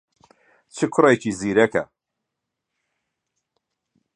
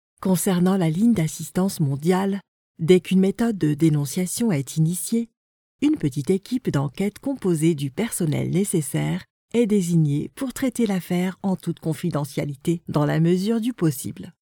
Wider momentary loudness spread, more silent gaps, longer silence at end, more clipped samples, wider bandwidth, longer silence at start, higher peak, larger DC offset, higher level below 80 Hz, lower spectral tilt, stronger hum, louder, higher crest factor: first, 17 LU vs 7 LU; second, none vs 2.48-2.74 s, 5.37-5.79 s, 9.30-9.48 s; first, 2.3 s vs 0.2 s; neither; second, 10.5 kHz vs over 20 kHz; first, 0.75 s vs 0.2 s; about the same, -2 dBFS vs -4 dBFS; neither; second, -62 dBFS vs -56 dBFS; about the same, -5.5 dB/octave vs -6.5 dB/octave; neither; first, -20 LUFS vs -23 LUFS; about the same, 22 dB vs 18 dB